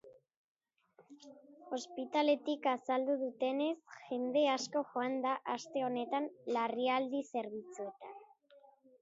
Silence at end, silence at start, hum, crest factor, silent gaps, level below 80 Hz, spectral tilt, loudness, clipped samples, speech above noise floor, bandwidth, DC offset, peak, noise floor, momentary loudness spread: 0.4 s; 0.05 s; none; 18 dB; 0.37-0.55 s; under -90 dBFS; -2 dB/octave; -36 LUFS; under 0.1%; 47 dB; 7.6 kHz; under 0.1%; -20 dBFS; -83 dBFS; 14 LU